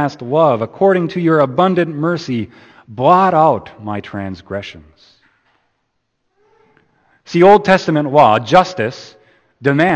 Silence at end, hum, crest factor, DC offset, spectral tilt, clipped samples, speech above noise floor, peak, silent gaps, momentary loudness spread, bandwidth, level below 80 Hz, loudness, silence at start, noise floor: 0 s; none; 16 dB; under 0.1%; -7 dB/octave; under 0.1%; 55 dB; 0 dBFS; none; 16 LU; 8.6 kHz; -54 dBFS; -13 LUFS; 0 s; -69 dBFS